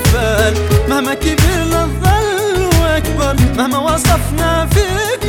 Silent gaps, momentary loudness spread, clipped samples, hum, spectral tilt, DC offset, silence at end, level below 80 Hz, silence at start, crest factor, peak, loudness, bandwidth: none; 2 LU; under 0.1%; none; -5 dB/octave; under 0.1%; 0 s; -20 dBFS; 0 s; 12 dB; 0 dBFS; -13 LUFS; 19.5 kHz